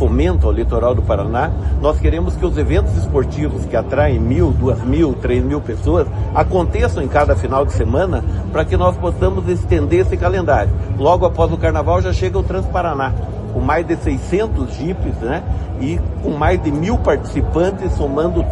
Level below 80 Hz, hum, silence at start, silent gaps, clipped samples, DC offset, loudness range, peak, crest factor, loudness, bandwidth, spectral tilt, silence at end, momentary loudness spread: -22 dBFS; none; 0 s; none; under 0.1%; under 0.1%; 3 LU; 0 dBFS; 14 dB; -17 LUFS; 9 kHz; -8 dB/octave; 0 s; 6 LU